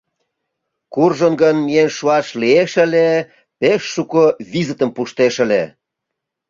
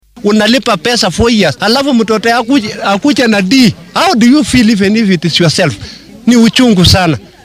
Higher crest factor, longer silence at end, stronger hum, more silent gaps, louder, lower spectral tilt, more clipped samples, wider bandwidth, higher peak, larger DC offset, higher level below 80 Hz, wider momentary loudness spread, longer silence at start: first, 14 dB vs 8 dB; first, 0.8 s vs 0.25 s; neither; neither; second, -15 LUFS vs -9 LUFS; about the same, -5.5 dB/octave vs -4.5 dB/octave; second, under 0.1% vs 0.3%; second, 7.6 kHz vs 16 kHz; about the same, -2 dBFS vs 0 dBFS; neither; second, -60 dBFS vs -34 dBFS; about the same, 7 LU vs 6 LU; first, 0.9 s vs 0.15 s